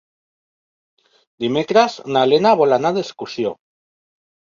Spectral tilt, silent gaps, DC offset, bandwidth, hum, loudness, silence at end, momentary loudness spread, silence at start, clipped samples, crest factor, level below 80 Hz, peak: -5.5 dB/octave; none; under 0.1%; 7.4 kHz; none; -17 LUFS; 0.95 s; 11 LU; 1.4 s; under 0.1%; 18 dB; -64 dBFS; -2 dBFS